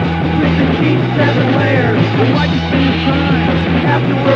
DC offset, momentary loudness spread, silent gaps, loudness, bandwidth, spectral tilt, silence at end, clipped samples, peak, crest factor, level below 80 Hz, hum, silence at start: under 0.1%; 2 LU; none; -13 LUFS; 7 kHz; -8 dB/octave; 0 s; under 0.1%; 0 dBFS; 12 dB; -30 dBFS; none; 0 s